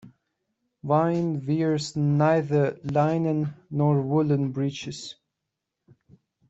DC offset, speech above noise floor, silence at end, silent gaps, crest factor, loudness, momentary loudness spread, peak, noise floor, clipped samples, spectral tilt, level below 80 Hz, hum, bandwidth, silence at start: under 0.1%; 60 dB; 1.35 s; none; 18 dB; -24 LUFS; 11 LU; -8 dBFS; -84 dBFS; under 0.1%; -7.5 dB/octave; -64 dBFS; none; 8 kHz; 0.05 s